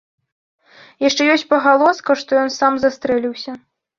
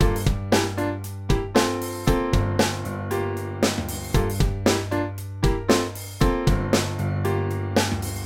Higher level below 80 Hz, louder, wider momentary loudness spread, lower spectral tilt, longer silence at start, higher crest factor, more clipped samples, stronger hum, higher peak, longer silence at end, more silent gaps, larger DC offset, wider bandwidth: second, -60 dBFS vs -30 dBFS; first, -16 LUFS vs -24 LUFS; first, 13 LU vs 6 LU; second, -3 dB/octave vs -5 dB/octave; first, 1 s vs 0 s; about the same, 16 dB vs 18 dB; neither; neither; about the same, -2 dBFS vs -4 dBFS; first, 0.4 s vs 0 s; neither; neither; second, 7.4 kHz vs 17.5 kHz